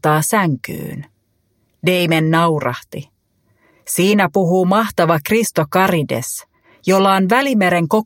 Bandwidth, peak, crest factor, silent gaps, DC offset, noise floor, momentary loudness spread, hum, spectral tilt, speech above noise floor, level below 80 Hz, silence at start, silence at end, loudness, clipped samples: 17 kHz; 0 dBFS; 16 dB; none; under 0.1%; -63 dBFS; 14 LU; none; -5 dB/octave; 48 dB; -56 dBFS; 0.05 s; 0 s; -16 LUFS; under 0.1%